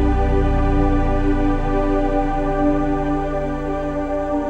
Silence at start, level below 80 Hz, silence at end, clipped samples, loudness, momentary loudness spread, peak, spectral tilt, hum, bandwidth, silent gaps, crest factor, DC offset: 0 s; -22 dBFS; 0 s; under 0.1%; -20 LUFS; 5 LU; -6 dBFS; -8.5 dB/octave; none; 7.4 kHz; none; 12 dB; under 0.1%